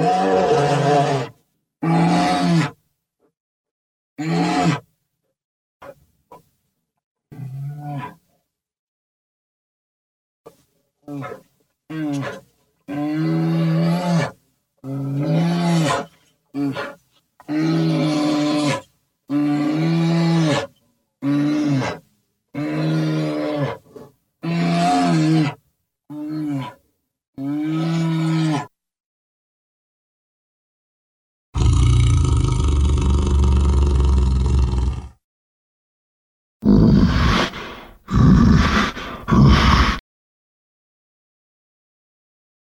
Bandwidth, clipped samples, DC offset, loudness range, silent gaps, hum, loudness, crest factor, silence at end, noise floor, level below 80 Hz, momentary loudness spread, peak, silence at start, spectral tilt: 12 kHz; under 0.1%; under 0.1%; 19 LU; 3.40-3.64 s, 3.71-4.16 s, 5.44-5.80 s, 7.04-7.15 s, 8.79-10.44 s, 27.28-27.33 s, 29.00-31.53 s, 35.24-36.60 s; none; -19 LUFS; 18 dB; 2.8 s; -74 dBFS; -26 dBFS; 17 LU; -2 dBFS; 0 s; -6.5 dB/octave